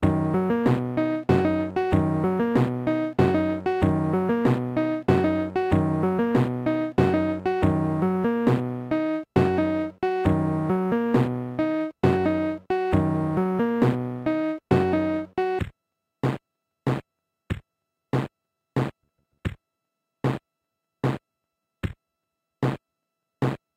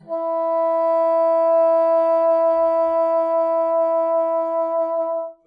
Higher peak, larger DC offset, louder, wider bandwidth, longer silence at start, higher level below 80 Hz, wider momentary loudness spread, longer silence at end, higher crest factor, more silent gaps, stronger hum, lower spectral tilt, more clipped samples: first, -6 dBFS vs -10 dBFS; neither; second, -24 LUFS vs -19 LUFS; first, 13 kHz vs 4.9 kHz; about the same, 0 s vs 0.1 s; first, -48 dBFS vs -68 dBFS; first, 9 LU vs 5 LU; about the same, 0.2 s vs 0.15 s; first, 18 dB vs 8 dB; neither; neither; first, -9 dB/octave vs -6.5 dB/octave; neither